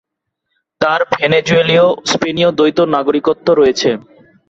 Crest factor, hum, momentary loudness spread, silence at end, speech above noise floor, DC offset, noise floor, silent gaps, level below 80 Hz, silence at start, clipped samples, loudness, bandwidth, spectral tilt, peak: 14 dB; none; 5 LU; 0.5 s; 61 dB; under 0.1%; -73 dBFS; none; -52 dBFS; 0.8 s; under 0.1%; -13 LUFS; 8 kHz; -4.5 dB/octave; 0 dBFS